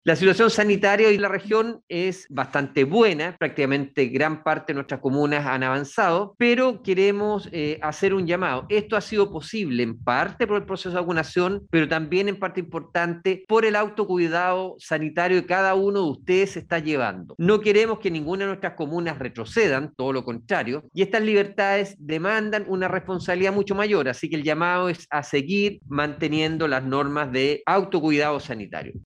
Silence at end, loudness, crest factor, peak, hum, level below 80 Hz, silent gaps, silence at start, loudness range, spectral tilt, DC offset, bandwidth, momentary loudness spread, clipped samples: 0.05 s; -23 LUFS; 20 dB; -2 dBFS; none; -60 dBFS; 1.83-1.88 s; 0.05 s; 2 LU; -5.5 dB/octave; under 0.1%; 10.5 kHz; 8 LU; under 0.1%